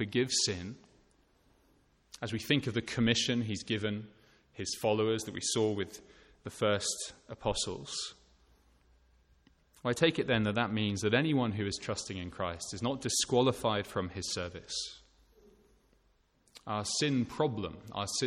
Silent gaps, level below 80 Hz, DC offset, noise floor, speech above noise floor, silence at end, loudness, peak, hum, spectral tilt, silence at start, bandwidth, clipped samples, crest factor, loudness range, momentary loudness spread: none; -60 dBFS; under 0.1%; -71 dBFS; 38 dB; 0 s; -33 LUFS; -14 dBFS; none; -4 dB/octave; 0 s; 16.5 kHz; under 0.1%; 20 dB; 5 LU; 13 LU